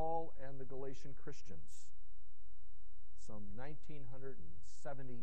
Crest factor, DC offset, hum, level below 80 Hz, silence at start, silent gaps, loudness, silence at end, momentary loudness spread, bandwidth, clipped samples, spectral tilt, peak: 20 dB; 3%; none; -62 dBFS; 0 s; none; -52 LUFS; 0 s; 19 LU; 9 kHz; under 0.1%; -6.5 dB/octave; -26 dBFS